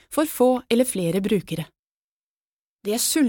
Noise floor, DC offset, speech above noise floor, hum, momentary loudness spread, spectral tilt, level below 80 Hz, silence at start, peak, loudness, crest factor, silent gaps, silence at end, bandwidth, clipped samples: under -90 dBFS; under 0.1%; over 69 dB; none; 12 LU; -4.5 dB/octave; -58 dBFS; 0.1 s; -8 dBFS; -22 LUFS; 16 dB; 1.79-1.83 s, 1.91-2.77 s; 0 s; 18 kHz; under 0.1%